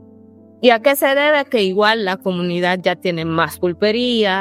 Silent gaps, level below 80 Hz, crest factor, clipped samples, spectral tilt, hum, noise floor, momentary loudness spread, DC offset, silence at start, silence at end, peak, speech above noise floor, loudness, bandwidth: none; -62 dBFS; 16 dB; under 0.1%; -4.5 dB/octave; none; -44 dBFS; 6 LU; under 0.1%; 0.6 s; 0 s; 0 dBFS; 28 dB; -16 LUFS; 16.5 kHz